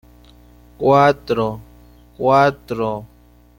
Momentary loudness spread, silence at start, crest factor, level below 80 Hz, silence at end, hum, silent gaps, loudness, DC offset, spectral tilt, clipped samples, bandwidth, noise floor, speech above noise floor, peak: 11 LU; 0.8 s; 18 dB; -48 dBFS; 0.55 s; 60 Hz at -45 dBFS; none; -17 LUFS; under 0.1%; -7 dB/octave; under 0.1%; 17 kHz; -46 dBFS; 30 dB; -2 dBFS